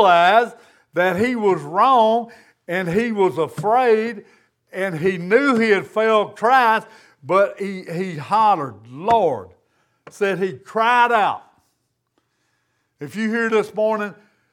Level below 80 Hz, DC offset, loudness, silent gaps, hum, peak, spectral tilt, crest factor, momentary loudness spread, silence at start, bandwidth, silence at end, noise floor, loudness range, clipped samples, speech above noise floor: -64 dBFS; under 0.1%; -18 LUFS; none; none; -2 dBFS; -5.5 dB/octave; 18 dB; 13 LU; 0 s; 15 kHz; 0.4 s; -71 dBFS; 4 LU; under 0.1%; 52 dB